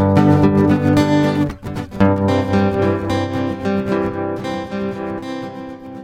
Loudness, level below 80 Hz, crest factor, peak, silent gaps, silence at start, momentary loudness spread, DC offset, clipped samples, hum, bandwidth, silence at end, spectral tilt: -17 LUFS; -42 dBFS; 16 dB; 0 dBFS; none; 0 s; 14 LU; under 0.1%; under 0.1%; none; 15 kHz; 0 s; -8 dB/octave